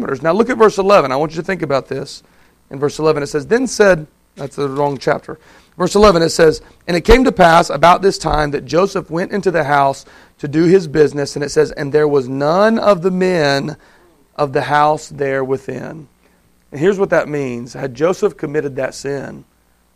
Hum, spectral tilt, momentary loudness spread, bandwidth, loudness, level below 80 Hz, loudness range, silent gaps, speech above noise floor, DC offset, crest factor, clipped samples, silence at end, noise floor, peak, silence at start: none; -5.5 dB/octave; 15 LU; 14.5 kHz; -15 LUFS; -34 dBFS; 7 LU; none; 39 dB; under 0.1%; 16 dB; under 0.1%; 0.55 s; -54 dBFS; 0 dBFS; 0 s